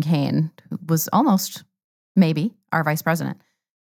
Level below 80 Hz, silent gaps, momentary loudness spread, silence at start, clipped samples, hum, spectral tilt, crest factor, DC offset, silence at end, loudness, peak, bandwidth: -76 dBFS; 1.84-2.15 s; 13 LU; 0 s; under 0.1%; none; -6 dB/octave; 16 dB; under 0.1%; 0.5 s; -21 LUFS; -4 dBFS; 18 kHz